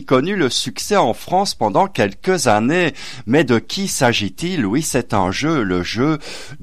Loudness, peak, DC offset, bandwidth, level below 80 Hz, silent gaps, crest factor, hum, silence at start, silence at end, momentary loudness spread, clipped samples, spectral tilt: -17 LUFS; -4 dBFS; 2%; 15 kHz; -44 dBFS; none; 14 dB; none; 0 s; 0.05 s; 5 LU; under 0.1%; -4.5 dB/octave